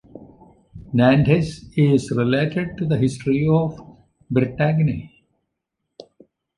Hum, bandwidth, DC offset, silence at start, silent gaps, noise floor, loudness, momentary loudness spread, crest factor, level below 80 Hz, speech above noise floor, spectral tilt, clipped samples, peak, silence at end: none; 11 kHz; under 0.1%; 0.15 s; none; -79 dBFS; -20 LUFS; 9 LU; 18 dB; -48 dBFS; 60 dB; -8 dB/octave; under 0.1%; -2 dBFS; 1.5 s